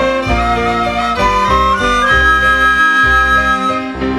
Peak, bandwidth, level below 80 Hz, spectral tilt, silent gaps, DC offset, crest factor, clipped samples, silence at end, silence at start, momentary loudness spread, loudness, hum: 0 dBFS; 13.5 kHz; -24 dBFS; -4.5 dB/octave; none; under 0.1%; 12 dB; under 0.1%; 0 s; 0 s; 6 LU; -11 LUFS; none